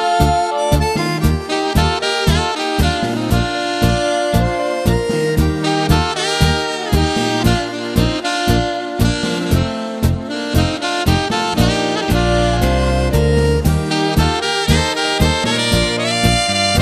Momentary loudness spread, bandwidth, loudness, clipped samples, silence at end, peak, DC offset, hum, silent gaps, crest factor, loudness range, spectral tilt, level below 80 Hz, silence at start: 3 LU; 14 kHz; -16 LUFS; under 0.1%; 0 s; 0 dBFS; under 0.1%; none; none; 16 dB; 2 LU; -5 dB/octave; -24 dBFS; 0 s